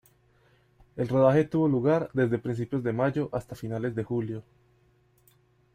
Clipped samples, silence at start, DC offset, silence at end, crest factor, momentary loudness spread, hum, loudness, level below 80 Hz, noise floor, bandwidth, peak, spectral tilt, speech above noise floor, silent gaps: under 0.1%; 0.95 s; under 0.1%; 1.35 s; 20 dB; 13 LU; none; -27 LUFS; -60 dBFS; -64 dBFS; 15.5 kHz; -10 dBFS; -9 dB/octave; 38 dB; none